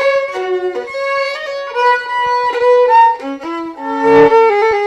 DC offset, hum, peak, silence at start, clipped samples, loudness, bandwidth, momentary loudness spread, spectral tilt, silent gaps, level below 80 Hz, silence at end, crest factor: under 0.1%; none; 0 dBFS; 0 s; under 0.1%; -13 LUFS; 9.4 kHz; 13 LU; -5 dB/octave; none; -52 dBFS; 0 s; 12 dB